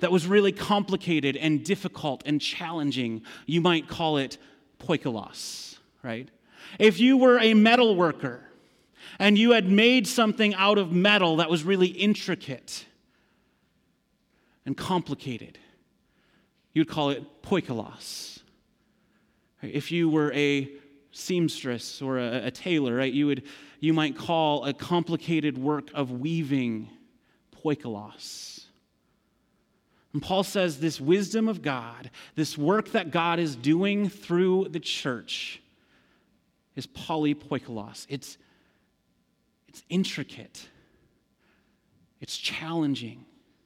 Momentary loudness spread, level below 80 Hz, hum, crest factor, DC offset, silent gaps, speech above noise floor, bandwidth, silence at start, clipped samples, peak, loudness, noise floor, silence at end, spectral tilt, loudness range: 19 LU; -68 dBFS; none; 20 dB; under 0.1%; none; 45 dB; 16 kHz; 0 s; under 0.1%; -6 dBFS; -25 LUFS; -71 dBFS; 0.45 s; -5 dB/octave; 14 LU